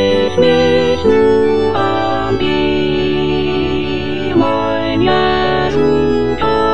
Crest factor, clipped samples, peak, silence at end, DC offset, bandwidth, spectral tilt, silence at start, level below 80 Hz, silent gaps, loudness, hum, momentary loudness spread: 12 dB; under 0.1%; 0 dBFS; 0 s; 5%; 9.4 kHz; -6.5 dB/octave; 0 s; -34 dBFS; none; -14 LUFS; none; 5 LU